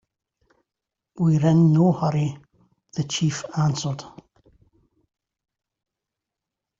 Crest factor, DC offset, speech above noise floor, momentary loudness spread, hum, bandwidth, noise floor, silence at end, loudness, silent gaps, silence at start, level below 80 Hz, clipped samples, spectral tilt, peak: 18 dB; under 0.1%; 66 dB; 13 LU; none; 7.8 kHz; -86 dBFS; 2.7 s; -22 LUFS; none; 1.15 s; -60 dBFS; under 0.1%; -6.5 dB/octave; -6 dBFS